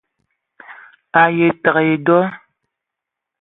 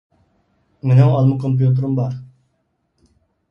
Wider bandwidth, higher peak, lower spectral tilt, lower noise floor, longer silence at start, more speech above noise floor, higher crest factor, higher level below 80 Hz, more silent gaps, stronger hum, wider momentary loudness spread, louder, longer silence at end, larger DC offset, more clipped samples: second, 4 kHz vs 5.4 kHz; about the same, 0 dBFS vs 0 dBFS; about the same, -10.5 dB/octave vs -10.5 dB/octave; first, -82 dBFS vs -68 dBFS; second, 0.7 s vs 0.85 s; first, 68 dB vs 53 dB; about the same, 18 dB vs 18 dB; second, -62 dBFS vs -54 dBFS; neither; neither; second, 4 LU vs 13 LU; about the same, -15 LUFS vs -16 LUFS; second, 1.05 s vs 1.25 s; neither; neither